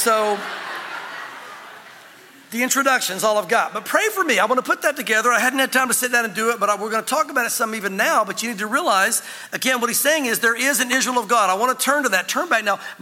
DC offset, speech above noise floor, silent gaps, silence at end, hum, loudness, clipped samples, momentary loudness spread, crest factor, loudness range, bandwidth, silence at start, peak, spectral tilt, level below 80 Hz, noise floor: under 0.1%; 26 dB; none; 0.05 s; none; -19 LUFS; under 0.1%; 12 LU; 18 dB; 4 LU; 17 kHz; 0 s; -2 dBFS; -1.5 dB/octave; -82 dBFS; -45 dBFS